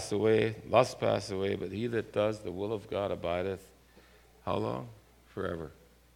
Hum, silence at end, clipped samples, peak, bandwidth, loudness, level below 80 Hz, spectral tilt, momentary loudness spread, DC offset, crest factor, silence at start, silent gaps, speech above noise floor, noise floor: none; 0.4 s; under 0.1%; -10 dBFS; 16.5 kHz; -32 LUFS; -60 dBFS; -6 dB/octave; 15 LU; under 0.1%; 24 dB; 0 s; none; 28 dB; -59 dBFS